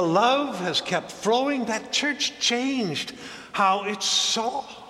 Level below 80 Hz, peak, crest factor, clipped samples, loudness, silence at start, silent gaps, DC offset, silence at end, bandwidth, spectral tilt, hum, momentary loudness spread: -68 dBFS; -8 dBFS; 18 dB; under 0.1%; -24 LUFS; 0 s; none; under 0.1%; 0 s; 15 kHz; -2.5 dB/octave; none; 9 LU